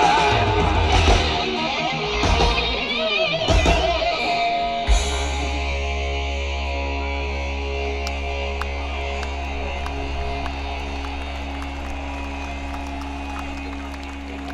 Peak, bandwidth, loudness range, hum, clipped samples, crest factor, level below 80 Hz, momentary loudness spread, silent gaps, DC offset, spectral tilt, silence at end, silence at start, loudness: -4 dBFS; 11.5 kHz; 10 LU; none; under 0.1%; 18 dB; -26 dBFS; 12 LU; none; under 0.1%; -4.5 dB/octave; 0 s; 0 s; -23 LUFS